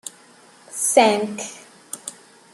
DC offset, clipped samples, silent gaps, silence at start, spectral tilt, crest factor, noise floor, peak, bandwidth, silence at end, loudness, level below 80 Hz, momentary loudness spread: under 0.1%; under 0.1%; none; 0.05 s; -2 dB/octave; 22 dB; -50 dBFS; -2 dBFS; 14 kHz; 0.4 s; -19 LUFS; -74 dBFS; 21 LU